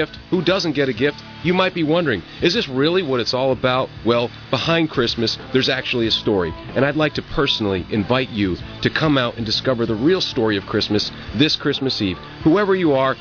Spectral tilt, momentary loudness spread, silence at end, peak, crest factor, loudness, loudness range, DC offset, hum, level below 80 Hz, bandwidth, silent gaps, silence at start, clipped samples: -5.5 dB/octave; 5 LU; 0 s; -2 dBFS; 16 dB; -19 LUFS; 1 LU; under 0.1%; none; -44 dBFS; 5.4 kHz; none; 0 s; under 0.1%